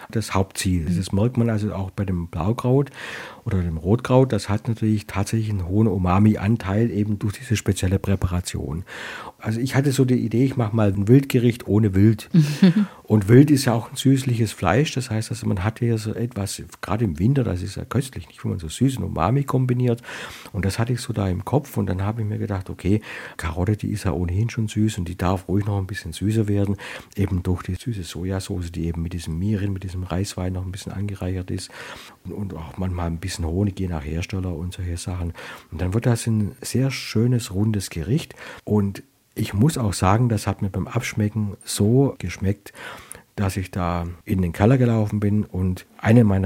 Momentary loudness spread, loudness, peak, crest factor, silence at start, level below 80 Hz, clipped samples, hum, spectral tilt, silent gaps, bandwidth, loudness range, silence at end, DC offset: 12 LU; -22 LUFS; -2 dBFS; 20 dB; 0 s; -46 dBFS; under 0.1%; none; -6.5 dB/octave; none; 16.5 kHz; 9 LU; 0 s; under 0.1%